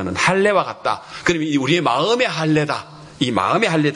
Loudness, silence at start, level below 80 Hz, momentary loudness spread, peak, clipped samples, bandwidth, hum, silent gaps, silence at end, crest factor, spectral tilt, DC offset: -18 LUFS; 0 s; -54 dBFS; 7 LU; -4 dBFS; under 0.1%; 11 kHz; none; none; 0 s; 16 dB; -5 dB/octave; under 0.1%